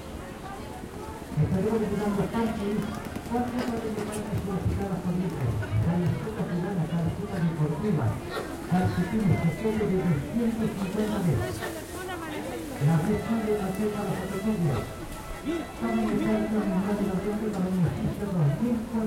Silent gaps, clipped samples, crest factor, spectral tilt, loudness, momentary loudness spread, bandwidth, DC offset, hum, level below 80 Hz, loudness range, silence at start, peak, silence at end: none; under 0.1%; 16 dB; -7.5 dB/octave; -28 LUFS; 9 LU; 16.5 kHz; under 0.1%; none; -46 dBFS; 2 LU; 0 s; -12 dBFS; 0 s